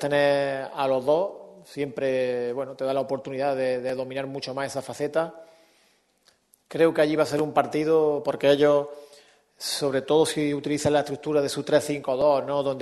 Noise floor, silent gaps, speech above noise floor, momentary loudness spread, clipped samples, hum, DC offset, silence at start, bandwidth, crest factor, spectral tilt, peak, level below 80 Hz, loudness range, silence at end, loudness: -64 dBFS; none; 40 dB; 10 LU; under 0.1%; none; under 0.1%; 0 s; 12.5 kHz; 18 dB; -5 dB/octave; -6 dBFS; -66 dBFS; 6 LU; 0 s; -25 LUFS